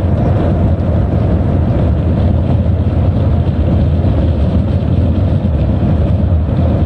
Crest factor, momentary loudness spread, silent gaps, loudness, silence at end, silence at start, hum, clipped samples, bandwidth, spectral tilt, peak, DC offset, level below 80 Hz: 8 dB; 1 LU; none; -13 LUFS; 0 s; 0 s; none; under 0.1%; 4.6 kHz; -10.5 dB/octave; -4 dBFS; under 0.1%; -20 dBFS